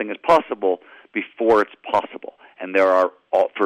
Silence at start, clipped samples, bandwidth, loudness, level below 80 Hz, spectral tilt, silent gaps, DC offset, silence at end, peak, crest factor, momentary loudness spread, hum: 0 s; under 0.1%; 10.5 kHz; -20 LUFS; -62 dBFS; -5.5 dB/octave; none; under 0.1%; 0 s; -6 dBFS; 14 dB; 17 LU; none